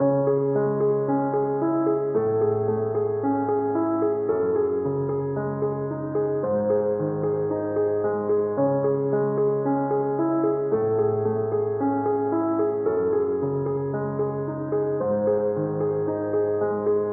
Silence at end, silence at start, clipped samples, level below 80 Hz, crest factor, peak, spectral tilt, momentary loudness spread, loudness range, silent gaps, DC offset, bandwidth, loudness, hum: 0 s; 0 s; under 0.1%; -64 dBFS; 12 dB; -12 dBFS; -6.5 dB/octave; 4 LU; 2 LU; none; under 0.1%; 2.2 kHz; -24 LUFS; none